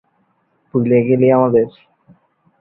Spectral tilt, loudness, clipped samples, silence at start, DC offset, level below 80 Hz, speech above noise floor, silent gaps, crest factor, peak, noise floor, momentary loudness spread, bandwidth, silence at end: -13 dB/octave; -15 LUFS; under 0.1%; 0.75 s; under 0.1%; -56 dBFS; 49 dB; none; 16 dB; -2 dBFS; -62 dBFS; 10 LU; 4.1 kHz; 0.9 s